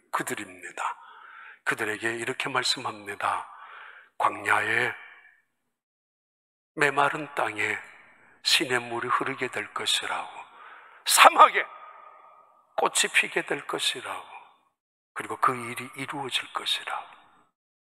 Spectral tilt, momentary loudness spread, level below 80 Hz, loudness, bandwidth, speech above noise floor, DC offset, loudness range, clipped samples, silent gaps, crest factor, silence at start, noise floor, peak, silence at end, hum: -1.5 dB/octave; 19 LU; -82 dBFS; -25 LUFS; 16 kHz; 45 dB; under 0.1%; 8 LU; under 0.1%; 5.83-6.75 s, 14.80-15.15 s; 28 dB; 0.15 s; -71 dBFS; 0 dBFS; 0.8 s; none